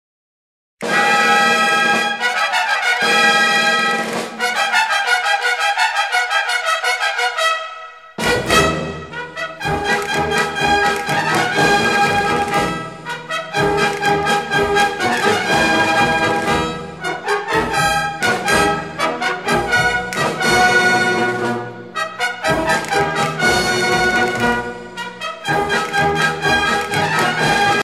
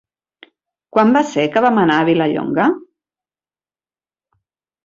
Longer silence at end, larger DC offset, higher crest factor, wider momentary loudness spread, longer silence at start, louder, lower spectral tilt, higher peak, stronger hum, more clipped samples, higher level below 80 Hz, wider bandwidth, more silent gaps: second, 0 s vs 2.05 s; first, 0.2% vs under 0.1%; about the same, 16 dB vs 16 dB; first, 11 LU vs 5 LU; second, 0.8 s vs 0.95 s; about the same, -16 LUFS vs -15 LUFS; second, -3 dB/octave vs -6.5 dB/octave; about the same, -2 dBFS vs -2 dBFS; neither; neither; first, -42 dBFS vs -60 dBFS; first, 16 kHz vs 7.6 kHz; neither